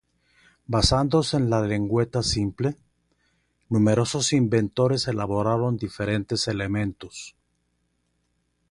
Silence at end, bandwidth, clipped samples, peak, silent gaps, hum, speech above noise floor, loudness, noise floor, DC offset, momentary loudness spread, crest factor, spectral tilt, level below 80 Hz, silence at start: 1.4 s; 11.5 kHz; under 0.1%; -6 dBFS; none; 60 Hz at -45 dBFS; 49 dB; -24 LUFS; -72 dBFS; under 0.1%; 8 LU; 20 dB; -5.5 dB/octave; -44 dBFS; 0.7 s